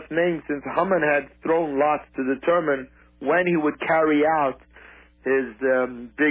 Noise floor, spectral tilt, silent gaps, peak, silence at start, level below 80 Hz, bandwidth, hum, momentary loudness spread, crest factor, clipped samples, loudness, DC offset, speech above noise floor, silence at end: -49 dBFS; -10 dB/octave; none; -8 dBFS; 0 s; -56 dBFS; 4 kHz; none; 8 LU; 14 dB; under 0.1%; -23 LUFS; under 0.1%; 27 dB; 0 s